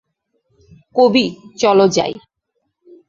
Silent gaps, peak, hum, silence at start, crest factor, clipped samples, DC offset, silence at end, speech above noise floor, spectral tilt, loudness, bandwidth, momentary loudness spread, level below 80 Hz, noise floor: none; 0 dBFS; none; 0.95 s; 16 dB; under 0.1%; under 0.1%; 0.9 s; 58 dB; -4.5 dB/octave; -15 LUFS; 7.6 kHz; 11 LU; -58 dBFS; -72 dBFS